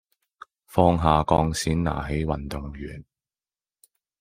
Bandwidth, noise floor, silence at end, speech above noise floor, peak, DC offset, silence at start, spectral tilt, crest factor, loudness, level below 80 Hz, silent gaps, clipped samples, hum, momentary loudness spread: 16 kHz; under -90 dBFS; 1.2 s; over 67 dB; -2 dBFS; under 0.1%; 0.7 s; -6 dB/octave; 24 dB; -24 LUFS; -40 dBFS; none; under 0.1%; none; 17 LU